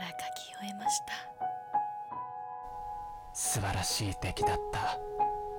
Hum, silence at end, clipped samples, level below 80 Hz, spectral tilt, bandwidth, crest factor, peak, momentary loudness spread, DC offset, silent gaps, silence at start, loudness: none; 0 s; under 0.1%; -52 dBFS; -3 dB/octave; 17.5 kHz; 16 dB; -20 dBFS; 10 LU; under 0.1%; none; 0 s; -35 LUFS